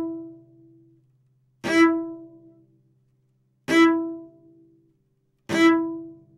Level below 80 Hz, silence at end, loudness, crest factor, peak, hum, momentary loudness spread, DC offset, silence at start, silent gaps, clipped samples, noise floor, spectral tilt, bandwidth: -72 dBFS; 0.25 s; -21 LUFS; 18 dB; -8 dBFS; none; 21 LU; under 0.1%; 0 s; none; under 0.1%; -69 dBFS; -4.5 dB/octave; 11.5 kHz